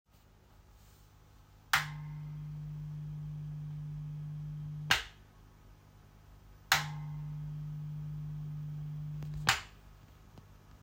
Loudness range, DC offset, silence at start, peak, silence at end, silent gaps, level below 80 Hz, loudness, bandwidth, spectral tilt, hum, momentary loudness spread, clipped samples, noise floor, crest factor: 3 LU; under 0.1%; 0.15 s; -10 dBFS; 0 s; none; -56 dBFS; -37 LUFS; 16 kHz; -3 dB/octave; 50 Hz at -45 dBFS; 20 LU; under 0.1%; -62 dBFS; 30 dB